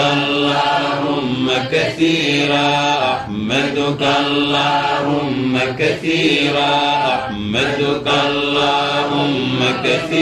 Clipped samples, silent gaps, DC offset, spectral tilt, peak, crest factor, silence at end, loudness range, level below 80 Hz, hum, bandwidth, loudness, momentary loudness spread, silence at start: under 0.1%; none; under 0.1%; -4.5 dB/octave; -4 dBFS; 14 dB; 0 s; 1 LU; -48 dBFS; none; 12.5 kHz; -16 LUFS; 4 LU; 0 s